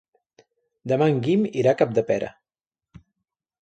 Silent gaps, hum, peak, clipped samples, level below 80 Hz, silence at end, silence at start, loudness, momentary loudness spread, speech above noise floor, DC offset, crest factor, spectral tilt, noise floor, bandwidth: none; none; -6 dBFS; under 0.1%; -62 dBFS; 1.3 s; 0.85 s; -22 LUFS; 9 LU; over 69 dB; under 0.1%; 18 dB; -7.5 dB/octave; under -90 dBFS; 8.8 kHz